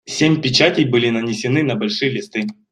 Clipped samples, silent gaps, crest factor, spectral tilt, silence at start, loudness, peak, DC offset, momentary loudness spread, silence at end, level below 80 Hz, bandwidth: under 0.1%; none; 16 dB; -5 dB/octave; 0.05 s; -17 LUFS; 0 dBFS; under 0.1%; 9 LU; 0.2 s; -56 dBFS; 10.5 kHz